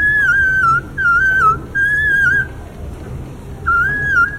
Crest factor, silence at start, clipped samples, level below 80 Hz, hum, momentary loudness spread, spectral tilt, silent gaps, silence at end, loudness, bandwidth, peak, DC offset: 12 dB; 0 s; under 0.1%; -32 dBFS; none; 19 LU; -5 dB/octave; none; 0 s; -13 LUFS; 16 kHz; -4 dBFS; under 0.1%